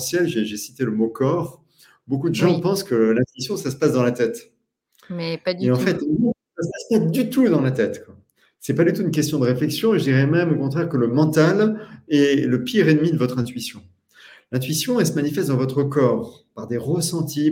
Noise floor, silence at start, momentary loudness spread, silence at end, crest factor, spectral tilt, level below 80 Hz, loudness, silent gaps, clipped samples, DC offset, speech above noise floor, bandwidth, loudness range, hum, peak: -64 dBFS; 0 s; 11 LU; 0 s; 16 dB; -6 dB/octave; -60 dBFS; -20 LUFS; none; under 0.1%; under 0.1%; 44 dB; 17 kHz; 4 LU; none; -4 dBFS